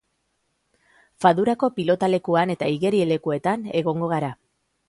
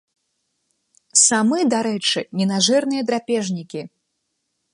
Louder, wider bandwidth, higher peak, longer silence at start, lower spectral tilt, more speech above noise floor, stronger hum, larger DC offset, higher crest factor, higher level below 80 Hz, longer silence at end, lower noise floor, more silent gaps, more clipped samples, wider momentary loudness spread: second, -22 LUFS vs -18 LUFS; about the same, 11.5 kHz vs 11.5 kHz; second, -4 dBFS vs 0 dBFS; about the same, 1.2 s vs 1.15 s; first, -7 dB/octave vs -3 dB/octave; second, 51 dB vs 55 dB; neither; neither; about the same, 20 dB vs 20 dB; first, -64 dBFS vs -70 dBFS; second, 0.55 s vs 0.85 s; about the same, -72 dBFS vs -74 dBFS; neither; neither; second, 5 LU vs 13 LU